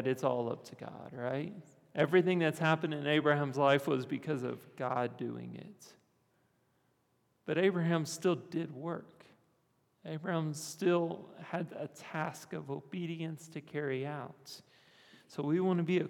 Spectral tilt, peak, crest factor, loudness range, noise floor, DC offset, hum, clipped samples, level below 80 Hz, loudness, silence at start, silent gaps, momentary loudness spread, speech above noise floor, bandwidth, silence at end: -6 dB/octave; -14 dBFS; 22 dB; 10 LU; -75 dBFS; under 0.1%; none; under 0.1%; -88 dBFS; -34 LUFS; 0 s; none; 17 LU; 41 dB; 17 kHz; 0 s